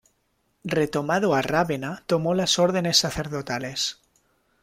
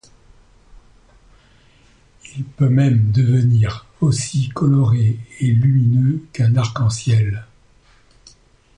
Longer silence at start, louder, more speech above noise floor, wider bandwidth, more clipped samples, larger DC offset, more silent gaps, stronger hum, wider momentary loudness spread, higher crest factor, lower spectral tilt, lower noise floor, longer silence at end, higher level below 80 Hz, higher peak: second, 0.65 s vs 2.35 s; second, -23 LUFS vs -17 LUFS; first, 47 dB vs 36 dB; first, 16 kHz vs 10 kHz; neither; neither; neither; neither; about the same, 9 LU vs 7 LU; first, 20 dB vs 14 dB; second, -4 dB/octave vs -7 dB/octave; first, -70 dBFS vs -52 dBFS; second, 0.7 s vs 1.35 s; second, -54 dBFS vs -44 dBFS; about the same, -6 dBFS vs -4 dBFS